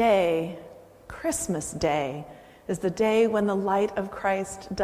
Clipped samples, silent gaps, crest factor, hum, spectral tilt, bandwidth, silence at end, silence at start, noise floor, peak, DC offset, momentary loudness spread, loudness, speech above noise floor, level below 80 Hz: under 0.1%; none; 16 dB; none; -5 dB/octave; 15.5 kHz; 0 s; 0 s; -45 dBFS; -10 dBFS; under 0.1%; 16 LU; -26 LUFS; 20 dB; -52 dBFS